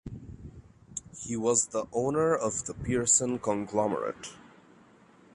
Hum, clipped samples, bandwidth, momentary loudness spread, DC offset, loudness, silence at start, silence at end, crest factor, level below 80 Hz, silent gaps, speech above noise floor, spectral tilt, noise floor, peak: none; under 0.1%; 11.5 kHz; 21 LU; under 0.1%; -28 LUFS; 0.05 s; 0.85 s; 22 dB; -56 dBFS; none; 29 dB; -4 dB/octave; -58 dBFS; -8 dBFS